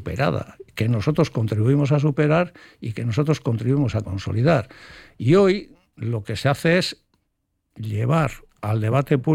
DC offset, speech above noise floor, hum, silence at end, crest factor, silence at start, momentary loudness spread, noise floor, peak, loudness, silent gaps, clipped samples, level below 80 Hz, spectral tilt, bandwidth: under 0.1%; 53 dB; none; 0 s; 16 dB; 0 s; 11 LU; -73 dBFS; -6 dBFS; -21 LUFS; none; under 0.1%; -50 dBFS; -7.5 dB/octave; 14.5 kHz